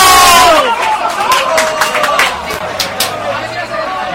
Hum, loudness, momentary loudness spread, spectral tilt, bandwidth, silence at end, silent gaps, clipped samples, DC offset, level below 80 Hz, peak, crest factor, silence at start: none; -10 LUFS; 13 LU; -1 dB/octave; over 20 kHz; 0 s; none; 0.6%; under 0.1%; -38 dBFS; 0 dBFS; 10 dB; 0 s